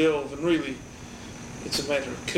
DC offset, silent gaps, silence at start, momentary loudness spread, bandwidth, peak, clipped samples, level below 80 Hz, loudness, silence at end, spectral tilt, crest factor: under 0.1%; none; 0 s; 15 LU; 16 kHz; -12 dBFS; under 0.1%; -52 dBFS; -28 LUFS; 0 s; -4 dB/octave; 16 dB